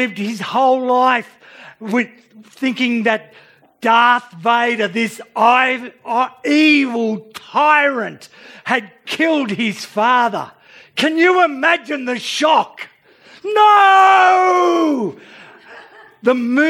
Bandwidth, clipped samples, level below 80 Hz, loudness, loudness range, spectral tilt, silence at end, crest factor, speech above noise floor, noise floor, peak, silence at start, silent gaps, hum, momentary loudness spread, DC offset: 16 kHz; under 0.1%; -76 dBFS; -15 LUFS; 5 LU; -4 dB/octave; 0 s; 16 dB; 31 dB; -46 dBFS; 0 dBFS; 0 s; none; none; 13 LU; under 0.1%